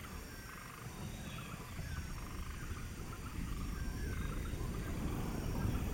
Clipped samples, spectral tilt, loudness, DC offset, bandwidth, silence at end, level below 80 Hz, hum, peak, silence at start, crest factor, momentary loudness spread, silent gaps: under 0.1%; -5.5 dB/octave; -44 LUFS; under 0.1%; 17 kHz; 0 s; -46 dBFS; none; -24 dBFS; 0 s; 16 dB; 8 LU; none